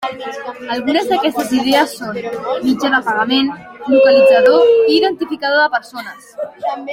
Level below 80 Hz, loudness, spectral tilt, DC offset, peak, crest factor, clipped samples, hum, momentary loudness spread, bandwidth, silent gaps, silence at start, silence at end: -58 dBFS; -14 LUFS; -4 dB/octave; under 0.1%; -2 dBFS; 14 dB; under 0.1%; none; 17 LU; 16.5 kHz; none; 0 s; 0 s